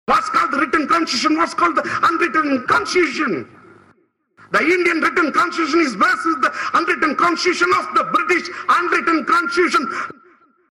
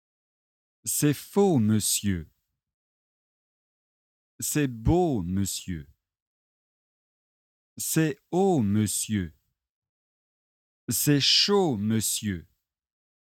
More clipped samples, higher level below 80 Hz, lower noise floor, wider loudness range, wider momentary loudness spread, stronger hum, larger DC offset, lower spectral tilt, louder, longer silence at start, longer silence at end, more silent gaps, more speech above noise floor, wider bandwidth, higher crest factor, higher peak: neither; second, -56 dBFS vs -50 dBFS; second, -58 dBFS vs under -90 dBFS; second, 2 LU vs 6 LU; second, 4 LU vs 13 LU; neither; neither; about the same, -3 dB/octave vs -4 dB/octave; first, -17 LUFS vs -25 LUFS; second, 0.1 s vs 0.85 s; second, 0.6 s vs 1 s; second, none vs 2.74-4.39 s, 6.22-7.76 s, 9.69-9.82 s, 9.89-10.88 s; second, 40 dB vs over 65 dB; second, 13 kHz vs 17.5 kHz; second, 12 dB vs 18 dB; first, -6 dBFS vs -10 dBFS